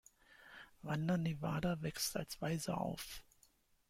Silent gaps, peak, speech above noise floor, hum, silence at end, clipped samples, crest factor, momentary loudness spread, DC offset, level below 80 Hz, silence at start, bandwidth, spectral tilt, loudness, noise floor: none; -24 dBFS; 33 dB; none; 0.7 s; under 0.1%; 18 dB; 16 LU; under 0.1%; -64 dBFS; 0.3 s; 16.5 kHz; -5 dB/octave; -40 LUFS; -73 dBFS